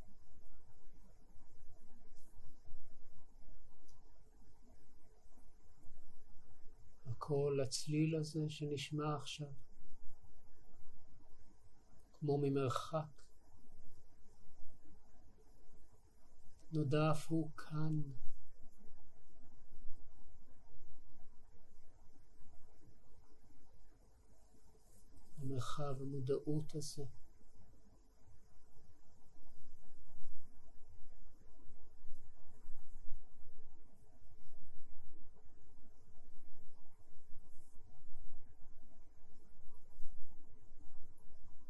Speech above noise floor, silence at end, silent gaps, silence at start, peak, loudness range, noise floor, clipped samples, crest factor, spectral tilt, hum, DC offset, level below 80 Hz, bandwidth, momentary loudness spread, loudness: 20 dB; 0 s; none; 0 s; -22 dBFS; 25 LU; -58 dBFS; under 0.1%; 16 dB; -6.5 dB/octave; none; under 0.1%; -60 dBFS; 12 kHz; 29 LU; -41 LUFS